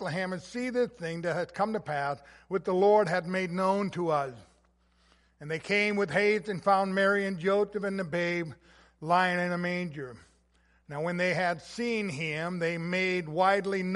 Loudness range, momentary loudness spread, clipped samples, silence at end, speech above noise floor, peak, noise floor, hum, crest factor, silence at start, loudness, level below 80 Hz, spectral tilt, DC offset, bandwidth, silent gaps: 4 LU; 10 LU; under 0.1%; 0 s; 38 dB; -12 dBFS; -67 dBFS; none; 18 dB; 0 s; -29 LUFS; -66 dBFS; -6 dB/octave; under 0.1%; 11.5 kHz; none